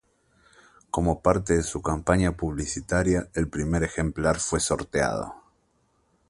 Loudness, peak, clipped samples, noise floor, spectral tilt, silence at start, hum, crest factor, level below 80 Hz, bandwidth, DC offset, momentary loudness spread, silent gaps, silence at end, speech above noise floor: -26 LUFS; -4 dBFS; under 0.1%; -68 dBFS; -5 dB/octave; 0.95 s; none; 22 dB; -38 dBFS; 11.5 kHz; under 0.1%; 6 LU; none; 0.9 s; 43 dB